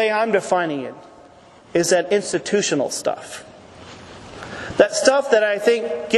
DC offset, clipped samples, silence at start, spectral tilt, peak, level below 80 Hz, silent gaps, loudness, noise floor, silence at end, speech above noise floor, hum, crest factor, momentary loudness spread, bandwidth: under 0.1%; under 0.1%; 0 s; -3 dB/octave; 0 dBFS; -58 dBFS; none; -19 LUFS; -47 dBFS; 0 s; 28 dB; none; 20 dB; 20 LU; 12.5 kHz